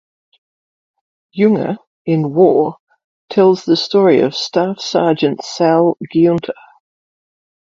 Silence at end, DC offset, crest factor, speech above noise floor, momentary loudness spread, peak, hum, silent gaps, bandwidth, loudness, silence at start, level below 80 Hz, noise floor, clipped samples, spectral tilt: 1.2 s; under 0.1%; 16 dB; over 77 dB; 9 LU; 0 dBFS; none; 1.87-2.05 s, 2.80-2.87 s, 3.04-3.28 s; 7.4 kHz; -14 LUFS; 1.35 s; -60 dBFS; under -90 dBFS; under 0.1%; -6.5 dB/octave